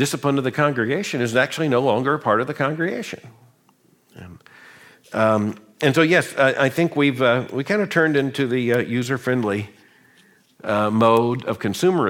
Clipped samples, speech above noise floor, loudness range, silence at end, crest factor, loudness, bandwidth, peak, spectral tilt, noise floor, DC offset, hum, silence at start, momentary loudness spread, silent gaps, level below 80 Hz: under 0.1%; 39 dB; 7 LU; 0 s; 18 dB; -20 LUFS; 17 kHz; -2 dBFS; -5.5 dB/octave; -59 dBFS; under 0.1%; none; 0 s; 8 LU; none; -64 dBFS